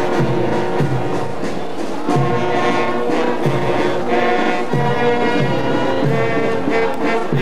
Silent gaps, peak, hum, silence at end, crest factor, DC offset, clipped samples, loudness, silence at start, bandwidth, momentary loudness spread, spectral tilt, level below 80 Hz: none; -4 dBFS; none; 0 s; 14 dB; 9%; under 0.1%; -18 LUFS; 0 s; 14 kHz; 6 LU; -6.5 dB/octave; -46 dBFS